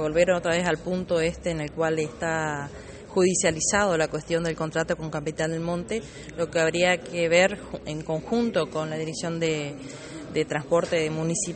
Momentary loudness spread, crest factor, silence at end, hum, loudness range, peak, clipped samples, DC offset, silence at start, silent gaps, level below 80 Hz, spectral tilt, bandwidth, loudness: 11 LU; 20 dB; 0 s; none; 2 LU; -6 dBFS; under 0.1%; under 0.1%; 0 s; none; -50 dBFS; -4 dB/octave; 8.8 kHz; -26 LUFS